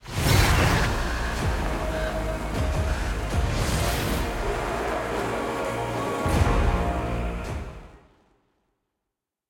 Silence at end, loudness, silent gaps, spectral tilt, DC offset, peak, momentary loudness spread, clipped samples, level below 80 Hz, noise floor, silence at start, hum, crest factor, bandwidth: 1.55 s; -26 LUFS; none; -5 dB/octave; under 0.1%; -6 dBFS; 9 LU; under 0.1%; -30 dBFS; -85 dBFS; 0.05 s; none; 18 dB; 17 kHz